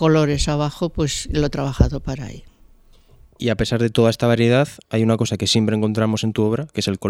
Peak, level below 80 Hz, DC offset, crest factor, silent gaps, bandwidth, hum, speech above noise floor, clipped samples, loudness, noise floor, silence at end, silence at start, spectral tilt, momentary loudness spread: 0 dBFS; -32 dBFS; under 0.1%; 20 dB; none; 14.5 kHz; none; 31 dB; under 0.1%; -19 LUFS; -49 dBFS; 0 s; 0 s; -5.5 dB/octave; 7 LU